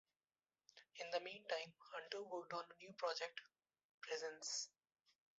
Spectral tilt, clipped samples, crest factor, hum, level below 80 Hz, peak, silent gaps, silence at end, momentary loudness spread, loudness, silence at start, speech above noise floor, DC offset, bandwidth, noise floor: 0 dB/octave; under 0.1%; 22 dB; none; under -90 dBFS; -28 dBFS; 3.84-4.01 s; 0.7 s; 12 LU; -48 LUFS; 0.75 s; over 41 dB; under 0.1%; 7.6 kHz; under -90 dBFS